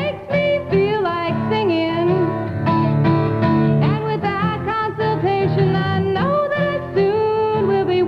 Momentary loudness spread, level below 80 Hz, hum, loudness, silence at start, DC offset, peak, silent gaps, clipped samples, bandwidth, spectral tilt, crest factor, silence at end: 4 LU; -44 dBFS; none; -18 LUFS; 0 s; under 0.1%; -6 dBFS; none; under 0.1%; 6 kHz; -9 dB/octave; 12 dB; 0 s